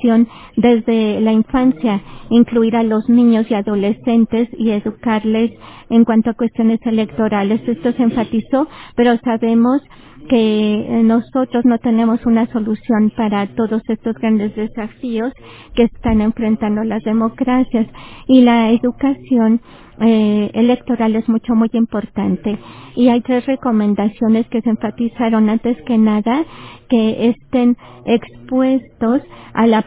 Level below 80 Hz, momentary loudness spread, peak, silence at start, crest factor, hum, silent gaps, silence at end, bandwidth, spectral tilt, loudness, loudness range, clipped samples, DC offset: -42 dBFS; 7 LU; 0 dBFS; 0 s; 14 dB; none; none; 0.05 s; 4 kHz; -11 dB/octave; -15 LUFS; 3 LU; under 0.1%; under 0.1%